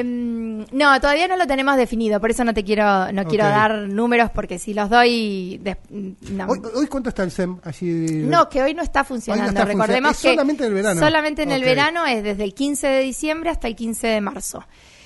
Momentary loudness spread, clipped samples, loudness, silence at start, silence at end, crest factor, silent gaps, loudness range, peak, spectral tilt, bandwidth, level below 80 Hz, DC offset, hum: 11 LU; under 0.1%; -19 LUFS; 0 s; 0.45 s; 18 dB; none; 4 LU; -2 dBFS; -4.5 dB/octave; 11.5 kHz; -40 dBFS; under 0.1%; none